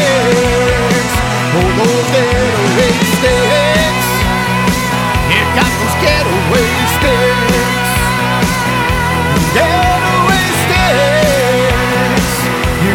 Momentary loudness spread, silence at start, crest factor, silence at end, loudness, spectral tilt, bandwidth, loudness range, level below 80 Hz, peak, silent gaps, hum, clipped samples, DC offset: 3 LU; 0 s; 10 dB; 0 s; -11 LUFS; -4.5 dB/octave; over 20 kHz; 1 LU; -24 dBFS; -2 dBFS; none; none; under 0.1%; under 0.1%